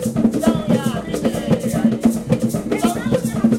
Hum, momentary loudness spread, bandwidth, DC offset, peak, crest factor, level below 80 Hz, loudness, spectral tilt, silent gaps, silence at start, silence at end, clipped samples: none; 4 LU; 16 kHz; under 0.1%; -4 dBFS; 14 dB; -42 dBFS; -19 LUFS; -6.5 dB/octave; none; 0 s; 0 s; under 0.1%